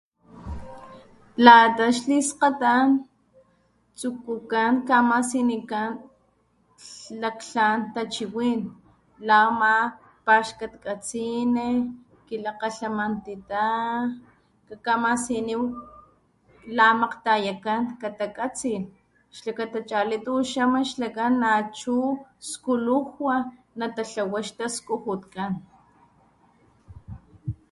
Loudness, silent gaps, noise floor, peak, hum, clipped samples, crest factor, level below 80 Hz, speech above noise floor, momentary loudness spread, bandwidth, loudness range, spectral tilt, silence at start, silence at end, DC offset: -23 LUFS; none; -65 dBFS; 0 dBFS; none; under 0.1%; 24 dB; -56 dBFS; 42 dB; 17 LU; 11.5 kHz; 9 LU; -4 dB/octave; 0.35 s; 0.2 s; under 0.1%